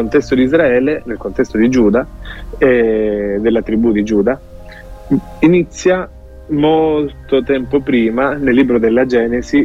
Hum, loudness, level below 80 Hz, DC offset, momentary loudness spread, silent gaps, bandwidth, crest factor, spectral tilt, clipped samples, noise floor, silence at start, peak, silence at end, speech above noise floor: none; -14 LUFS; -34 dBFS; under 0.1%; 7 LU; none; 8 kHz; 12 dB; -7 dB/octave; under 0.1%; -32 dBFS; 0 s; 0 dBFS; 0 s; 19 dB